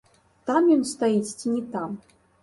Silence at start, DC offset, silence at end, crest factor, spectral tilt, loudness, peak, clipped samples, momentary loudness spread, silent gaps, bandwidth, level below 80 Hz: 0.45 s; under 0.1%; 0.45 s; 16 dB; -5 dB/octave; -24 LUFS; -8 dBFS; under 0.1%; 15 LU; none; 11.5 kHz; -68 dBFS